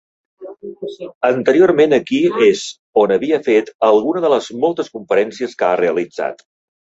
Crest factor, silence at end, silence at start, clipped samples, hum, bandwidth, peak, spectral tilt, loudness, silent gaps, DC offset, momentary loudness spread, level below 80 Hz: 16 dB; 0.5 s; 0.4 s; under 0.1%; none; 8 kHz; 0 dBFS; -5 dB/octave; -15 LUFS; 1.15-1.21 s, 2.79-2.93 s, 3.75-3.79 s; under 0.1%; 13 LU; -60 dBFS